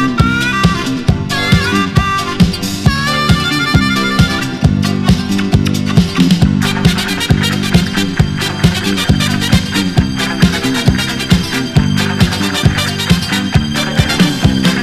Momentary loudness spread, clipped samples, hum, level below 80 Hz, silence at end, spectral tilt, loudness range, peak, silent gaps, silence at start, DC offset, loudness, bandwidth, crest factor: 3 LU; 0.3%; none; -26 dBFS; 0 s; -5 dB/octave; 1 LU; 0 dBFS; none; 0 s; under 0.1%; -13 LUFS; 14.5 kHz; 12 dB